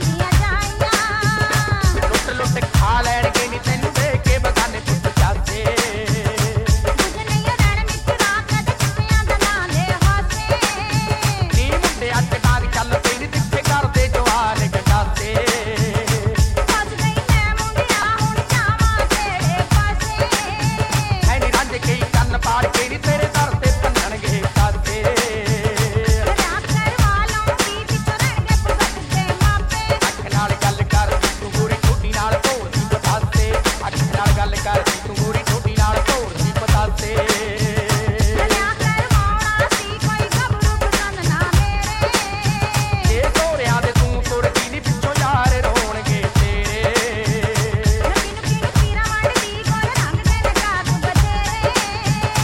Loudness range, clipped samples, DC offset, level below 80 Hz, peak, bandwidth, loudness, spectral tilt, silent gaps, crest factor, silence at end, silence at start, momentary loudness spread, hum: 1 LU; under 0.1%; 0.2%; -24 dBFS; -2 dBFS; 17 kHz; -18 LUFS; -4.5 dB/octave; none; 14 dB; 0 s; 0 s; 3 LU; none